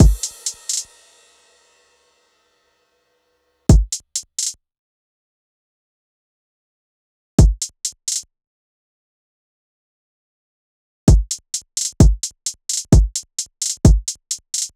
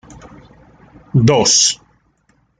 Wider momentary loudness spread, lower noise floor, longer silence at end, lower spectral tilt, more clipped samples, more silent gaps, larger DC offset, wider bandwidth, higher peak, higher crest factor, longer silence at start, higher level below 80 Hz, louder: about the same, 10 LU vs 10 LU; first, -66 dBFS vs -59 dBFS; second, 0.1 s vs 0.85 s; first, -5 dB/octave vs -3.5 dB/octave; neither; first, 4.79-7.38 s, 8.47-11.07 s vs none; neither; first, 14 kHz vs 11 kHz; about the same, -2 dBFS vs -2 dBFS; about the same, 18 dB vs 16 dB; second, 0 s vs 1.15 s; first, -22 dBFS vs -46 dBFS; second, -19 LUFS vs -12 LUFS